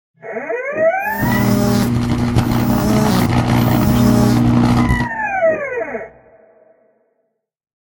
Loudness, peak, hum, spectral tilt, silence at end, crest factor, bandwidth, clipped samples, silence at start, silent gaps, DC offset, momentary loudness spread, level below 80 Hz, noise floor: -15 LUFS; 0 dBFS; none; -6.5 dB/octave; 1.8 s; 16 dB; 17 kHz; under 0.1%; 0.25 s; none; under 0.1%; 11 LU; -30 dBFS; -69 dBFS